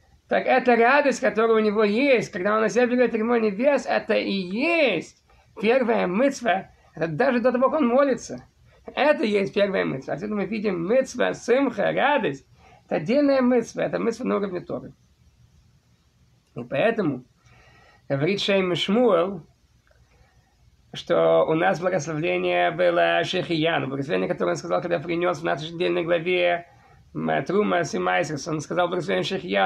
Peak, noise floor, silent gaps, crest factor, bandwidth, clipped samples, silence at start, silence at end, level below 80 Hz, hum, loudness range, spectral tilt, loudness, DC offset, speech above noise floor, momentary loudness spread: -6 dBFS; -61 dBFS; none; 16 dB; 10.5 kHz; under 0.1%; 0.3 s; 0 s; -60 dBFS; none; 5 LU; -5.5 dB/octave; -23 LUFS; under 0.1%; 38 dB; 10 LU